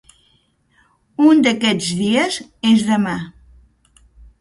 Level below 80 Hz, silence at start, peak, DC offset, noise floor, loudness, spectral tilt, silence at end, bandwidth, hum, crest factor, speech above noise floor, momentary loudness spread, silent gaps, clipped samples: -52 dBFS; 1.2 s; -2 dBFS; under 0.1%; -60 dBFS; -16 LUFS; -4.5 dB/octave; 1.1 s; 11.5 kHz; none; 18 dB; 44 dB; 13 LU; none; under 0.1%